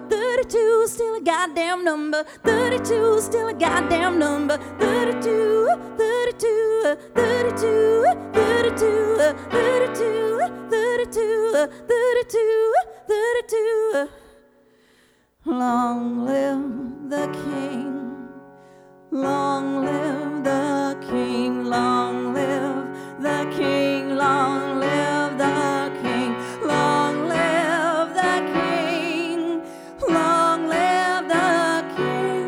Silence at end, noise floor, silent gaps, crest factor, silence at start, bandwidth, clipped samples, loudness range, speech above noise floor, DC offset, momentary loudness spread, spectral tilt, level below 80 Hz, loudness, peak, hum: 0 s; -59 dBFS; none; 16 dB; 0 s; 16 kHz; under 0.1%; 6 LU; 38 dB; under 0.1%; 8 LU; -4.5 dB/octave; -56 dBFS; -21 LUFS; -4 dBFS; none